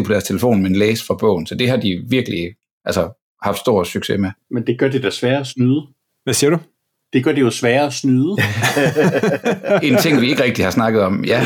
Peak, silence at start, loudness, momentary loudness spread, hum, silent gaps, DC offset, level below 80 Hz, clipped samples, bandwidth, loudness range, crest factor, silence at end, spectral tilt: -4 dBFS; 0 s; -17 LUFS; 7 LU; none; 2.71-2.81 s, 3.22-3.37 s; under 0.1%; -52 dBFS; under 0.1%; 19 kHz; 4 LU; 12 dB; 0 s; -5.5 dB/octave